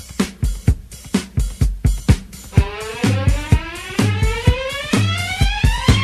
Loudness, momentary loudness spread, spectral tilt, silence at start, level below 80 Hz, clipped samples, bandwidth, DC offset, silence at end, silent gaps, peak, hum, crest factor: -19 LUFS; 6 LU; -5.5 dB/octave; 0 s; -22 dBFS; under 0.1%; 14 kHz; under 0.1%; 0 s; none; 0 dBFS; none; 18 dB